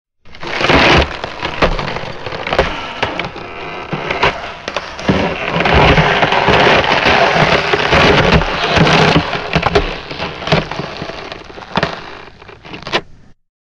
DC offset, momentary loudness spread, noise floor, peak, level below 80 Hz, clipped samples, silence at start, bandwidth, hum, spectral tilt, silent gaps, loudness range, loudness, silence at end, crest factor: under 0.1%; 16 LU; -37 dBFS; 0 dBFS; -28 dBFS; under 0.1%; 0.25 s; 10.5 kHz; none; -5 dB/octave; none; 9 LU; -13 LUFS; 0.3 s; 14 dB